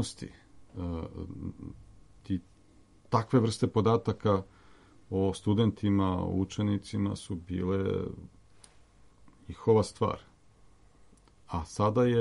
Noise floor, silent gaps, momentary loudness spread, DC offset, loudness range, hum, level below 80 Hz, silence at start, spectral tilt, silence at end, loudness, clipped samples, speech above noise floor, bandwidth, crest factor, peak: -60 dBFS; none; 15 LU; under 0.1%; 5 LU; none; -54 dBFS; 0 s; -7 dB/octave; 0 s; -31 LUFS; under 0.1%; 31 dB; 11.5 kHz; 20 dB; -10 dBFS